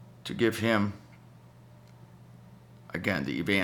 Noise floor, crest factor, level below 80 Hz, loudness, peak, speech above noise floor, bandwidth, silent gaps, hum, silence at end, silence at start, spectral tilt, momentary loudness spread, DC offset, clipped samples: -53 dBFS; 22 dB; -62 dBFS; -30 LUFS; -10 dBFS; 25 dB; 19 kHz; none; none; 0 s; 0 s; -5.5 dB/octave; 16 LU; under 0.1%; under 0.1%